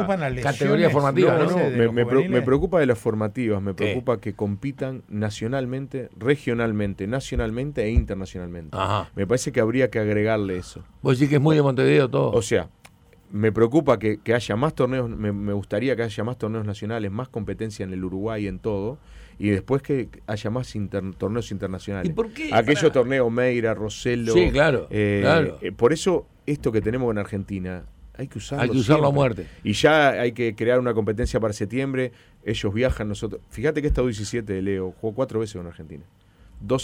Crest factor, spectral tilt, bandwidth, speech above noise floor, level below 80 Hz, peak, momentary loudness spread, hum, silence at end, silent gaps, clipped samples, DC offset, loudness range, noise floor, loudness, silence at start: 16 dB; -6.5 dB/octave; 15.5 kHz; 29 dB; -40 dBFS; -6 dBFS; 12 LU; none; 0 s; none; under 0.1%; under 0.1%; 6 LU; -52 dBFS; -23 LUFS; 0 s